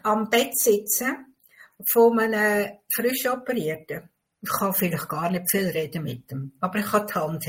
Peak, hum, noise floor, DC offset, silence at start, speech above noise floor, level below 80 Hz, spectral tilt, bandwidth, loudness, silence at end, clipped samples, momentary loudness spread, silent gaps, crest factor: -8 dBFS; none; -54 dBFS; under 0.1%; 0.05 s; 30 dB; -64 dBFS; -4 dB/octave; 16.5 kHz; -23 LUFS; 0 s; under 0.1%; 14 LU; none; 18 dB